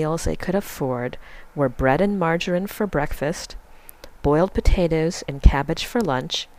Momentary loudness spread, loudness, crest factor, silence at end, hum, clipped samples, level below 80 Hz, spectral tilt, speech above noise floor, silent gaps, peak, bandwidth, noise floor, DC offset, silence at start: 9 LU; -22 LUFS; 22 dB; 0.15 s; none; under 0.1%; -26 dBFS; -5.5 dB/octave; 22 dB; none; 0 dBFS; 15.5 kHz; -43 dBFS; under 0.1%; 0 s